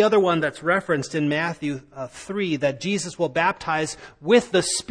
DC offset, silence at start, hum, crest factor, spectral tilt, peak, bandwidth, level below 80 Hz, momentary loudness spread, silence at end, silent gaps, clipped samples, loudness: under 0.1%; 0 s; none; 18 dB; -4 dB/octave; -6 dBFS; 10.5 kHz; -58 dBFS; 12 LU; 0.1 s; none; under 0.1%; -23 LUFS